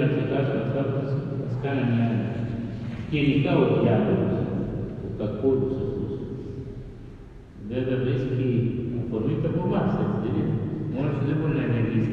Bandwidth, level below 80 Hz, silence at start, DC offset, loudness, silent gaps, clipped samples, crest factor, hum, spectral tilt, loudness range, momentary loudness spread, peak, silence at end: 5.6 kHz; -46 dBFS; 0 s; under 0.1%; -26 LUFS; none; under 0.1%; 16 dB; none; -10 dB/octave; 5 LU; 12 LU; -8 dBFS; 0 s